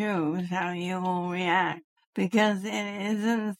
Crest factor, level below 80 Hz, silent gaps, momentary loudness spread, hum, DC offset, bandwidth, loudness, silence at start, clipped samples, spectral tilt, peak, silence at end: 18 dB; -76 dBFS; 1.84-1.96 s, 2.07-2.13 s; 7 LU; none; under 0.1%; 15.5 kHz; -28 LUFS; 0 s; under 0.1%; -5.5 dB/octave; -10 dBFS; 0.05 s